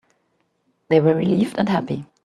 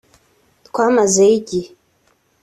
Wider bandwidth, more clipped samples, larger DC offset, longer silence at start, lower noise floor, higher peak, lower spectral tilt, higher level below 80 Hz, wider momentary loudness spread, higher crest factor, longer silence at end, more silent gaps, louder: about the same, 12 kHz vs 12.5 kHz; neither; neither; first, 0.9 s vs 0.75 s; first, -68 dBFS vs -60 dBFS; about the same, -2 dBFS vs -2 dBFS; first, -8 dB/octave vs -4 dB/octave; about the same, -60 dBFS vs -58 dBFS; second, 6 LU vs 13 LU; about the same, 18 dB vs 16 dB; second, 0.2 s vs 0.75 s; neither; second, -20 LUFS vs -15 LUFS